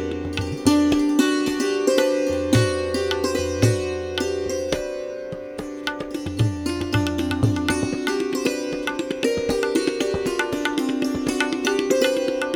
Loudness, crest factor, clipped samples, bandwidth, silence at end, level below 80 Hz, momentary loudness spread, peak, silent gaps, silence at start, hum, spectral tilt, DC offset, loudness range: -22 LUFS; 18 dB; under 0.1%; 18 kHz; 0 s; -44 dBFS; 9 LU; -4 dBFS; none; 0 s; none; -5 dB/octave; under 0.1%; 5 LU